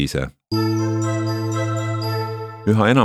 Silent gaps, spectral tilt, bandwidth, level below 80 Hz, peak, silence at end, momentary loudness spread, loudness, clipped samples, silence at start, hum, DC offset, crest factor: none; -6.5 dB/octave; 13 kHz; -44 dBFS; -2 dBFS; 0 s; 7 LU; -22 LUFS; under 0.1%; 0 s; none; under 0.1%; 18 dB